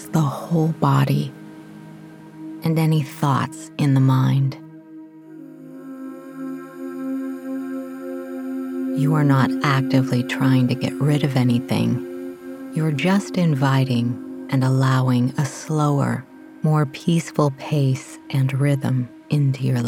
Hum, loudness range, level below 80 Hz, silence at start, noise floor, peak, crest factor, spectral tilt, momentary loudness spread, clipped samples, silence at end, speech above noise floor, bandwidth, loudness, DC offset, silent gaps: none; 9 LU; -64 dBFS; 0 s; -41 dBFS; -2 dBFS; 18 dB; -7 dB/octave; 20 LU; under 0.1%; 0 s; 22 dB; 15.5 kHz; -21 LUFS; under 0.1%; none